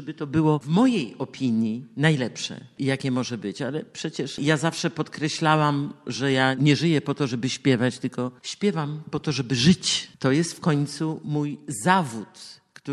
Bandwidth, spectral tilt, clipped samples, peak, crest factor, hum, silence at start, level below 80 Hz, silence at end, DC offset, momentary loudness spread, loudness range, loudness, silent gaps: 12 kHz; -5 dB/octave; under 0.1%; -2 dBFS; 22 dB; none; 0 s; -60 dBFS; 0 s; under 0.1%; 11 LU; 3 LU; -24 LUFS; none